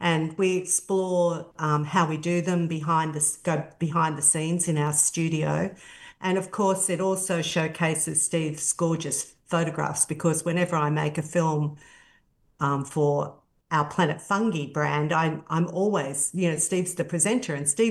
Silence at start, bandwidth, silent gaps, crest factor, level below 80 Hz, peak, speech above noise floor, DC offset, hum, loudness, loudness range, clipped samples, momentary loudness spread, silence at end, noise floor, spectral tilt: 0 s; 12.5 kHz; none; 18 dB; -66 dBFS; -6 dBFS; 38 dB; under 0.1%; none; -25 LUFS; 3 LU; under 0.1%; 6 LU; 0 s; -63 dBFS; -4.5 dB/octave